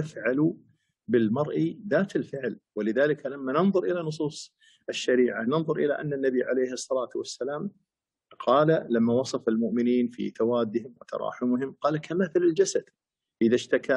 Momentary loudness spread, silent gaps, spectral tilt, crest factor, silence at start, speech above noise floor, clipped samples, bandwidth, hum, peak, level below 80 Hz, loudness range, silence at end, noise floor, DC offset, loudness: 10 LU; none; -6 dB/octave; 16 dB; 0 s; 35 dB; under 0.1%; 11 kHz; none; -10 dBFS; -74 dBFS; 2 LU; 0 s; -61 dBFS; under 0.1%; -27 LUFS